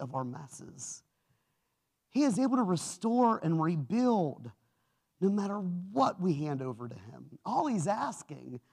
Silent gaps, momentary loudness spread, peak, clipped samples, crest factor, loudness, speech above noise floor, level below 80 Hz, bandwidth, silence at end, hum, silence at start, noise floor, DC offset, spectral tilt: none; 18 LU; -16 dBFS; under 0.1%; 18 dB; -31 LUFS; 49 dB; -78 dBFS; 13 kHz; 0.15 s; none; 0 s; -81 dBFS; under 0.1%; -6.5 dB/octave